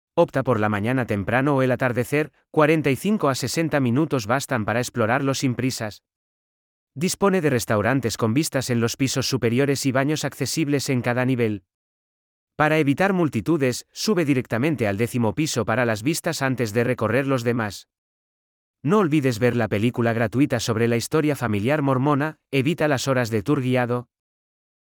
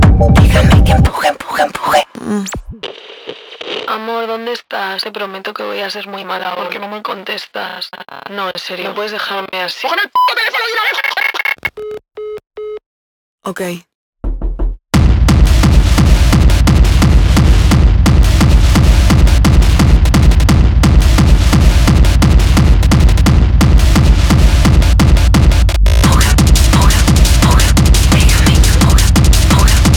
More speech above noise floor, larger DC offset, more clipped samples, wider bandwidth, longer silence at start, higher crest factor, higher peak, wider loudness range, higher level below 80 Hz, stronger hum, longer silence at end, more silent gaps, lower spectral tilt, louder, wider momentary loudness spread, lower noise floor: first, over 69 dB vs 12 dB; neither; neither; first, 19.5 kHz vs 17.5 kHz; first, 0.15 s vs 0 s; first, 18 dB vs 10 dB; second, -4 dBFS vs 0 dBFS; second, 2 LU vs 11 LU; second, -58 dBFS vs -12 dBFS; neither; first, 0.85 s vs 0 s; first, 6.16-6.87 s, 11.74-12.47 s, 17.98-18.74 s vs 12.86-13.38 s, 13.95-14.13 s; about the same, -5.5 dB/octave vs -5 dB/octave; second, -22 LUFS vs -11 LUFS; second, 4 LU vs 14 LU; first, under -90 dBFS vs -31 dBFS